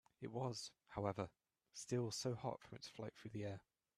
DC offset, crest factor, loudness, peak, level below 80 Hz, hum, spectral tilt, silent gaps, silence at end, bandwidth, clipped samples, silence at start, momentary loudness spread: under 0.1%; 22 dB; -48 LUFS; -26 dBFS; -76 dBFS; none; -5 dB/octave; none; 0.4 s; 14.5 kHz; under 0.1%; 0.2 s; 11 LU